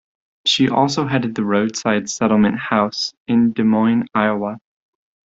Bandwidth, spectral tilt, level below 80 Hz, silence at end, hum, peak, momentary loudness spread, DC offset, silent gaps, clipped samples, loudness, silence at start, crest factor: 7.8 kHz; -5 dB/octave; -56 dBFS; 0.65 s; none; -2 dBFS; 6 LU; under 0.1%; 3.17-3.25 s; under 0.1%; -18 LUFS; 0.45 s; 16 dB